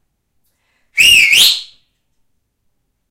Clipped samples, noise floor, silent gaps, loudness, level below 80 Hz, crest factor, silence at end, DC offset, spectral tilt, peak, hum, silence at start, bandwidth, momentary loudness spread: under 0.1%; -66 dBFS; none; -7 LUFS; -48 dBFS; 16 dB; 1.45 s; under 0.1%; 2.5 dB/octave; 0 dBFS; none; 0.95 s; 16 kHz; 15 LU